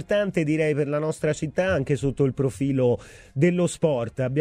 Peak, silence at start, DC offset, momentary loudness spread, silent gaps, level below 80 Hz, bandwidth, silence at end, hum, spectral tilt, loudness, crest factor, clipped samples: -8 dBFS; 0 s; under 0.1%; 4 LU; none; -50 dBFS; 12 kHz; 0 s; none; -7 dB/octave; -24 LUFS; 16 dB; under 0.1%